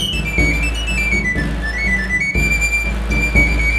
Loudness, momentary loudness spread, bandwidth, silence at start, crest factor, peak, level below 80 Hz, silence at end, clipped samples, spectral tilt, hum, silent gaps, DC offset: -16 LUFS; 5 LU; 12.5 kHz; 0 s; 16 dB; 0 dBFS; -20 dBFS; 0 s; under 0.1%; -4 dB/octave; none; none; under 0.1%